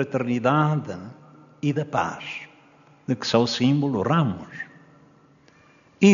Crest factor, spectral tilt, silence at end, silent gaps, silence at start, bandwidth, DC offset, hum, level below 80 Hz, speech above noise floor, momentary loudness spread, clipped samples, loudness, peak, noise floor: 20 dB; -5.5 dB/octave; 0 s; none; 0 s; 7.4 kHz; under 0.1%; none; -66 dBFS; 32 dB; 17 LU; under 0.1%; -23 LUFS; -4 dBFS; -56 dBFS